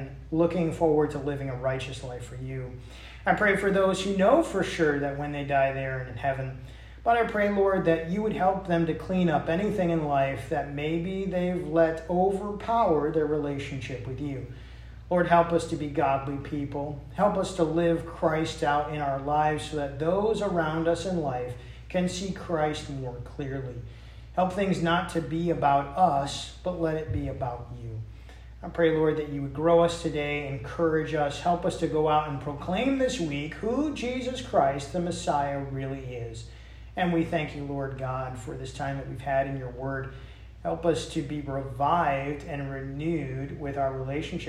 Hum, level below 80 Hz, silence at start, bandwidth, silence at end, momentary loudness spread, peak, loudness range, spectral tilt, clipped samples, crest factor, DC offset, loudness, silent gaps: none; -46 dBFS; 0 s; 13.5 kHz; 0 s; 13 LU; -8 dBFS; 5 LU; -6.5 dB/octave; under 0.1%; 20 dB; under 0.1%; -28 LUFS; none